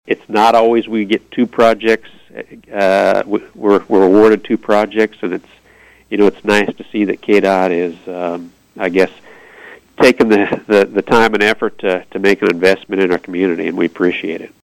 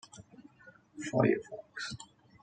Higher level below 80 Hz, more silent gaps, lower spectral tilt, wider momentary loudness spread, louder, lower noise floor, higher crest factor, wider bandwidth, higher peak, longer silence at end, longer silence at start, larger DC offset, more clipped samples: first, -52 dBFS vs -72 dBFS; neither; about the same, -5.5 dB/octave vs -6 dB/octave; second, 12 LU vs 25 LU; first, -14 LUFS vs -34 LUFS; second, -46 dBFS vs -60 dBFS; second, 14 dB vs 22 dB; first, 16 kHz vs 9.4 kHz; first, 0 dBFS vs -14 dBFS; second, 0.2 s vs 0.4 s; about the same, 0.05 s vs 0.15 s; neither; neither